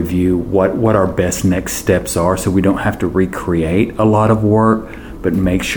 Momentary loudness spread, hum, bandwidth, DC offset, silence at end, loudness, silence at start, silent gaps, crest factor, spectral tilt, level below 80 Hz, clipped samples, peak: 5 LU; none; over 20 kHz; 0.2%; 0 s; -15 LUFS; 0 s; none; 14 dB; -6 dB/octave; -32 dBFS; under 0.1%; 0 dBFS